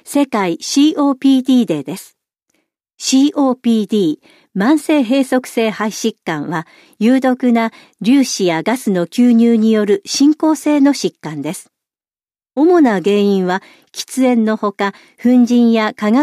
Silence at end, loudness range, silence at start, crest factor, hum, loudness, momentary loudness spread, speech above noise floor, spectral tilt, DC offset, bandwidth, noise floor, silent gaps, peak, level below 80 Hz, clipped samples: 0 s; 3 LU; 0.05 s; 12 dB; none; -14 LUFS; 11 LU; over 76 dB; -5 dB/octave; under 0.1%; 14.5 kHz; under -90 dBFS; none; -2 dBFS; -66 dBFS; under 0.1%